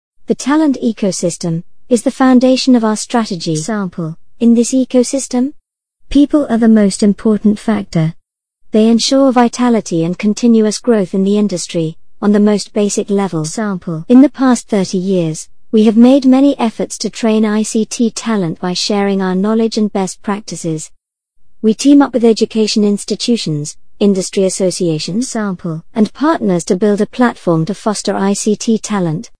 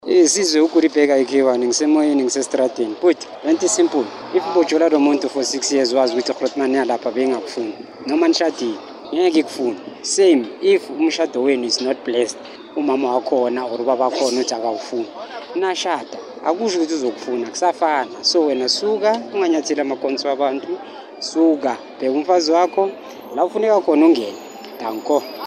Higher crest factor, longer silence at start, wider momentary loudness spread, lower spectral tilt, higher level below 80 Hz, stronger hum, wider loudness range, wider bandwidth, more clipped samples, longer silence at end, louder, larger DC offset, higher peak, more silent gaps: about the same, 12 dB vs 16 dB; first, 0.3 s vs 0.05 s; about the same, 10 LU vs 11 LU; first, -5.5 dB/octave vs -2.5 dB/octave; first, -44 dBFS vs -72 dBFS; neither; about the same, 3 LU vs 3 LU; second, 10.5 kHz vs 13.5 kHz; first, 0.2% vs under 0.1%; first, 0.15 s vs 0 s; first, -13 LUFS vs -18 LUFS; first, 1% vs under 0.1%; about the same, 0 dBFS vs -2 dBFS; neither